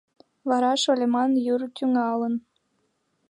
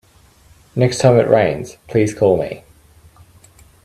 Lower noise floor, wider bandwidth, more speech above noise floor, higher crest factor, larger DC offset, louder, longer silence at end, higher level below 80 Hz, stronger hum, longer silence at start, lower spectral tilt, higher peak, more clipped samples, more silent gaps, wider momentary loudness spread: first, -72 dBFS vs -49 dBFS; second, 11 kHz vs 13.5 kHz; first, 49 dB vs 35 dB; about the same, 16 dB vs 18 dB; neither; second, -24 LUFS vs -16 LUFS; second, 0.9 s vs 1.25 s; second, -80 dBFS vs -50 dBFS; neither; second, 0.45 s vs 0.75 s; second, -3.5 dB/octave vs -6.5 dB/octave; second, -10 dBFS vs 0 dBFS; neither; neither; second, 7 LU vs 15 LU